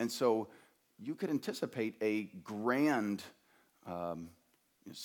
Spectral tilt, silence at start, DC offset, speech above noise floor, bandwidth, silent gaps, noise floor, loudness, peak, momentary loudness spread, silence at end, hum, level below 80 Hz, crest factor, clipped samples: -5.5 dB/octave; 0 s; under 0.1%; 33 dB; 19 kHz; none; -68 dBFS; -36 LUFS; -18 dBFS; 17 LU; 0 s; none; -80 dBFS; 18 dB; under 0.1%